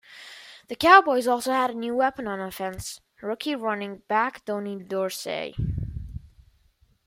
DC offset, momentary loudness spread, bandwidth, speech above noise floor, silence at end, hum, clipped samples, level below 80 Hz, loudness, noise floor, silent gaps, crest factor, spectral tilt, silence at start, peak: under 0.1%; 23 LU; 16 kHz; 39 dB; 0.8 s; none; under 0.1%; -46 dBFS; -24 LUFS; -63 dBFS; none; 24 dB; -4.5 dB/octave; 0.1 s; -2 dBFS